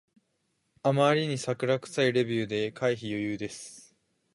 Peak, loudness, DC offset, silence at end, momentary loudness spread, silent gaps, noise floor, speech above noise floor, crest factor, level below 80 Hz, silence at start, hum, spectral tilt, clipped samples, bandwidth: -10 dBFS; -28 LUFS; under 0.1%; 0.55 s; 12 LU; none; -76 dBFS; 48 dB; 20 dB; -68 dBFS; 0.85 s; none; -5.5 dB/octave; under 0.1%; 11.5 kHz